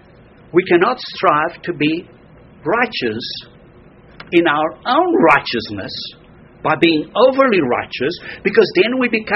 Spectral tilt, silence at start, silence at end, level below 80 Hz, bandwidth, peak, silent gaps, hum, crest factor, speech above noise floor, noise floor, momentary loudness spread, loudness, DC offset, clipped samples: -3 dB/octave; 0.55 s; 0 s; -52 dBFS; 6 kHz; 0 dBFS; none; none; 16 dB; 29 dB; -44 dBFS; 13 LU; -16 LUFS; under 0.1%; under 0.1%